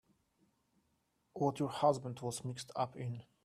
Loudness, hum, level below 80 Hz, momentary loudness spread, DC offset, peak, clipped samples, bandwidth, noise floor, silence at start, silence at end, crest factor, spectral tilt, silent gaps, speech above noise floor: -38 LUFS; none; -76 dBFS; 11 LU; under 0.1%; -18 dBFS; under 0.1%; 14 kHz; -79 dBFS; 1.35 s; 0.2 s; 22 dB; -6 dB/octave; none; 42 dB